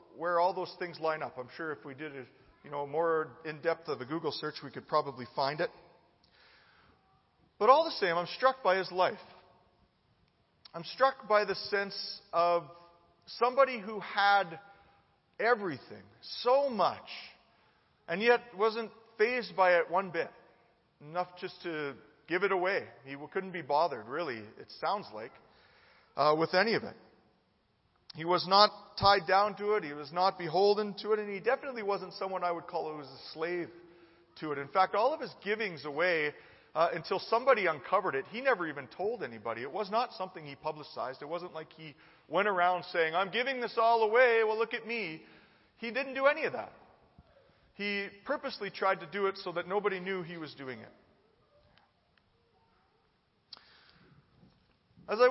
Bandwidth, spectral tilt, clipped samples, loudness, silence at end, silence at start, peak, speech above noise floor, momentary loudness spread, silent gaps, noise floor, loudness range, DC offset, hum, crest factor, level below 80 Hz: 6 kHz; -7 dB/octave; under 0.1%; -31 LUFS; 0 s; 0.15 s; -6 dBFS; 41 dB; 17 LU; none; -73 dBFS; 7 LU; under 0.1%; none; 26 dB; -72 dBFS